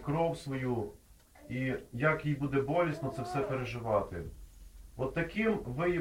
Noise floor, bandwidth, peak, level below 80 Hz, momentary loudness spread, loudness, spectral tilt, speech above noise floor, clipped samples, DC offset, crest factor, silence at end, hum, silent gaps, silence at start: -57 dBFS; 16.5 kHz; -14 dBFS; -54 dBFS; 11 LU; -34 LUFS; -7.5 dB/octave; 24 dB; under 0.1%; under 0.1%; 20 dB; 0 s; none; none; 0 s